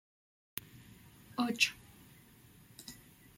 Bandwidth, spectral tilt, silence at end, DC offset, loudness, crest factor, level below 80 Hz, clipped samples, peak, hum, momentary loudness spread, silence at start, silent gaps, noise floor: 16.5 kHz; -2 dB/octave; 0.4 s; under 0.1%; -35 LUFS; 30 dB; -72 dBFS; under 0.1%; -12 dBFS; none; 27 LU; 0.55 s; none; -60 dBFS